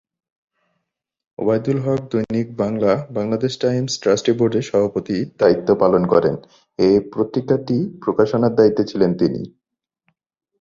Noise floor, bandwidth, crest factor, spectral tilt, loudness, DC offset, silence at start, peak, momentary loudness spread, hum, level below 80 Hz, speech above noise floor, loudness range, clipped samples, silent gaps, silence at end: -81 dBFS; 7.8 kHz; 18 dB; -6.5 dB/octave; -18 LUFS; under 0.1%; 1.4 s; -2 dBFS; 7 LU; none; -54 dBFS; 63 dB; 4 LU; under 0.1%; none; 1.1 s